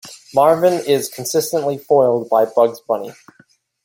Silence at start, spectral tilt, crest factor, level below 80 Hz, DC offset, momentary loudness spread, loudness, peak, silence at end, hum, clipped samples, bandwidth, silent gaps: 0.05 s; -4.5 dB/octave; 16 dB; -64 dBFS; under 0.1%; 9 LU; -17 LUFS; -2 dBFS; 0.7 s; none; under 0.1%; 17 kHz; none